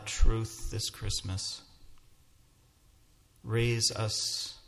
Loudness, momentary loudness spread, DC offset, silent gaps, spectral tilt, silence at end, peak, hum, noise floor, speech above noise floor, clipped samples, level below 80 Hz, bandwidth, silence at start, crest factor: -32 LUFS; 10 LU; under 0.1%; none; -3.5 dB/octave; 0.05 s; -12 dBFS; none; -63 dBFS; 33 dB; under 0.1%; -38 dBFS; 14.5 kHz; 0 s; 20 dB